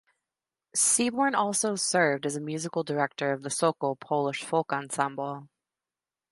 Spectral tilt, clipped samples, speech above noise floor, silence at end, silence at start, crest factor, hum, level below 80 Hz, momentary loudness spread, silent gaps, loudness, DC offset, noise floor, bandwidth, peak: -3 dB/octave; under 0.1%; over 62 dB; 0.85 s; 0.75 s; 20 dB; none; -78 dBFS; 9 LU; none; -27 LUFS; under 0.1%; under -90 dBFS; 12 kHz; -10 dBFS